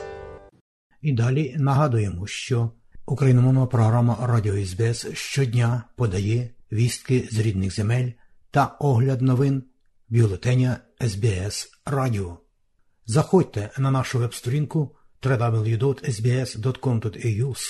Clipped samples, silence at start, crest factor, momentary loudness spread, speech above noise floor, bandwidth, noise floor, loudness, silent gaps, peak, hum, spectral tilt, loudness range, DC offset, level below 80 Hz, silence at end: under 0.1%; 0 s; 16 dB; 10 LU; 42 dB; 12.5 kHz; -63 dBFS; -23 LUFS; 0.61-0.90 s; -6 dBFS; none; -6.5 dB/octave; 3 LU; under 0.1%; -50 dBFS; 0 s